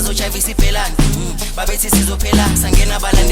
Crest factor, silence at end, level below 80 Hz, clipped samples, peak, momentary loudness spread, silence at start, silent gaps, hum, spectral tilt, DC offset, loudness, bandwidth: 12 dB; 0 s; -16 dBFS; under 0.1%; 0 dBFS; 6 LU; 0 s; none; none; -3.5 dB/octave; under 0.1%; -15 LUFS; 17 kHz